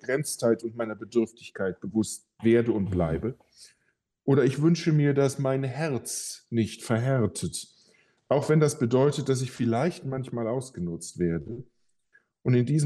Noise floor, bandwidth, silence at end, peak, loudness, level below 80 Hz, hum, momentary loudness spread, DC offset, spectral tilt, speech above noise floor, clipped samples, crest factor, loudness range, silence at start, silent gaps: -74 dBFS; 12.5 kHz; 0 s; -10 dBFS; -27 LUFS; -56 dBFS; none; 11 LU; under 0.1%; -6.5 dB/octave; 48 dB; under 0.1%; 16 dB; 3 LU; 0.05 s; none